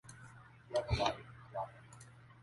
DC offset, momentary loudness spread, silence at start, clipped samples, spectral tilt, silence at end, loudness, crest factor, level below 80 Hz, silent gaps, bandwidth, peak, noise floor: under 0.1%; 21 LU; 0.05 s; under 0.1%; -5 dB/octave; 0 s; -40 LUFS; 24 dB; -54 dBFS; none; 11.5 kHz; -18 dBFS; -58 dBFS